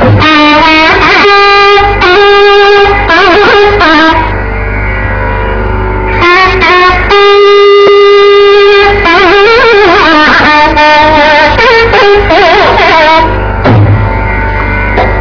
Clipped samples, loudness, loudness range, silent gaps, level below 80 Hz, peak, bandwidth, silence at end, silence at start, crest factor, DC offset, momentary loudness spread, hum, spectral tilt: 20%; -3 LUFS; 4 LU; none; -18 dBFS; 0 dBFS; 5.4 kHz; 0 s; 0 s; 4 dB; under 0.1%; 9 LU; none; -5.5 dB/octave